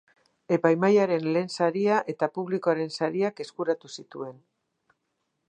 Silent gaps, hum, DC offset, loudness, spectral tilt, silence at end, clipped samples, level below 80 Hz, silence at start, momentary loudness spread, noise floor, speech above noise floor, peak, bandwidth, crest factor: none; none; under 0.1%; -26 LUFS; -6.5 dB/octave; 1.15 s; under 0.1%; -80 dBFS; 0.5 s; 16 LU; -78 dBFS; 52 dB; -6 dBFS; 9.6 kHz; 20 dB